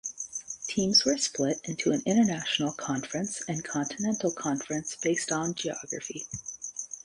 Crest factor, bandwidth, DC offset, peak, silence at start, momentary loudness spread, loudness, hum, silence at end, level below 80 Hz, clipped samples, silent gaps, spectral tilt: 20 dB; 11.5 kHz; under 0.1%; -10 dBFS; 0.05 s; 13 LU; -29 LUFS; none; 0.05 s; -66 dBFS; under 0.1%; none; -3 dB/octave